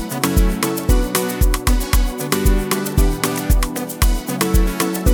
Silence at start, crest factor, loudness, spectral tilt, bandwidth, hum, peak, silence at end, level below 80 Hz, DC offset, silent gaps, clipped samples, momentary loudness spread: 0 s; 16 dB; -19 LUFS; -4.5 dB/octave; 19.5 kHz; none; 0 dBFS; 0 s; -18 dBFS; under 0.1%; none; under 0.1%; 2 LU